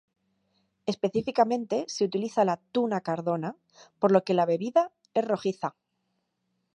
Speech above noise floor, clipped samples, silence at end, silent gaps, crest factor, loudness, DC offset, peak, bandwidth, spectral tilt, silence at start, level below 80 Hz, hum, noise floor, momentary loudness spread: 51 dB; under 0.1%; 1.05 s; none; 22 dB; -27 LUFS; under 0.1%; -6 dBFS; 10.5 kHz; -6 dB/octave; 0.85 s; -72 dBFS; none; -78 dBFS; 9 LU